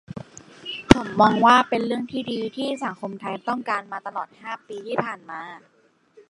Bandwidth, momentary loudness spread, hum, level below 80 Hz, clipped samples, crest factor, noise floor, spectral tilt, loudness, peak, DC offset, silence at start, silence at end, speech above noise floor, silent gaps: 11.5 kHz; 20 LU; none; -46 dBFS; under 0.1%; 24 dB; -55 dBFS; -5.5 dB/octave; -22 LUFS; 0 dBFS; under 0.1%; 0.1 s; 0.7 s; 31 dB; none